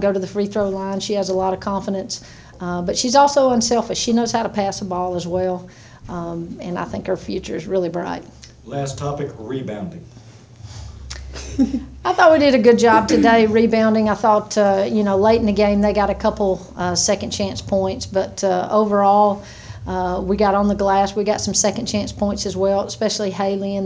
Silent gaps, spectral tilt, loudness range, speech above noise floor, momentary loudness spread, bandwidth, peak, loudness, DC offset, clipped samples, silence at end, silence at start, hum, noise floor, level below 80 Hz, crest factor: none; -4.5 dB/octave; 12 LU; 22 dB; 15 LU; 8 kHz; 0 dBFS; -18 LUFS; under 0.1%; under 0.1%; 0 s; 0 s; none; -40 dBFS; -40 dBFS; 18 dB